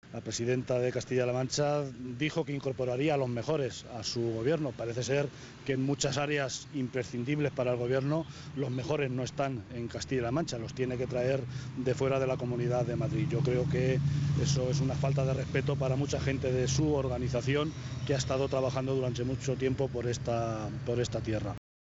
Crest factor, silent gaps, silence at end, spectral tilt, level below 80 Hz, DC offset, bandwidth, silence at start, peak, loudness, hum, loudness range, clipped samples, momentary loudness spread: 16 dB; none; 0.35 s; -6 dB/octave; -52 dBFS; under 0.1%; 8 kHz; 0.05 s; -16 dBFS; -32 LUFS; none; 3 LU; under 0.1%; 6 LU